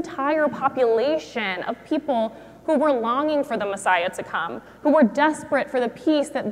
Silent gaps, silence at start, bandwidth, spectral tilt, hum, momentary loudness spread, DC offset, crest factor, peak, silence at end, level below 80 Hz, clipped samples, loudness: none; 0 s; 13.5 kHz; -4.5 dB/octave; none; 8 LU; under 0.1%; 16 dB; -6 dBFS; 0 s; -62 dBFS; under 0.1%; -22 LUFS